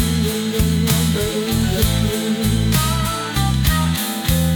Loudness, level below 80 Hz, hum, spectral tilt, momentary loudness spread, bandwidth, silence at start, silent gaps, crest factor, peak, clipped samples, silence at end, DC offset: -18 LUFS; -26 dBFS; none; -5 dB/octave; 3 LU; 19.5 kHz; 0 s; none; 14 dB; -4 dBFS; under 0.1%; 0 s; under 0.1%